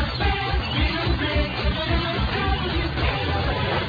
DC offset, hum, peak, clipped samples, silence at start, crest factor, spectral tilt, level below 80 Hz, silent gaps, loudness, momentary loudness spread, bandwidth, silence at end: under 0.1%; none; -10 dBFS; under 0.1%; 0 s; 14 dB; -7 dB/octave; -28 dBFS; none; -23 LUFS; 1 LU; 5 kHz; 0 s